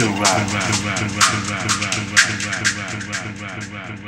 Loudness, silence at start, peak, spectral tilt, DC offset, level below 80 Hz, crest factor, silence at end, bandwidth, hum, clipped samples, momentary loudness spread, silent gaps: -18 LUFS; 0 s; 0 dBFS; -2.5 dB/octave; under 0.1%; -48 dBFS; 20 dB; 0 s; 16.5 kHz; none; under 0.1%; 14 LU; none